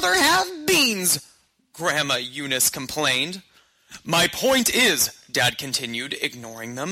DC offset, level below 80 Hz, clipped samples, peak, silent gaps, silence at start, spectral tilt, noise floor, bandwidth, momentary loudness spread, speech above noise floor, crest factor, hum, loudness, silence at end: under 0.1%; -56 dBFS; under 0.1%; -6 dBFS; none; 0 s; -1.5 dB/octave; -57 dBFS; 16.5 kHz; 11 LU; 34 dB; 16 dB; none; -21 LUFS; 0 s